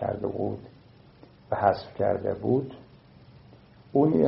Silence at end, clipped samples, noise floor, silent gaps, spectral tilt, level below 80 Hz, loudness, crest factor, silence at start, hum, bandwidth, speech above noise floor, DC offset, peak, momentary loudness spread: 0 s; under 0.1%; -53 dBFS; none; -7.5 dB/octave; -60 dBFS; -27 LUFS; 22 dB; 0 s; none; 5.8 kHz; 29 dB; under 0.1%; -6 dBFS; 13 LU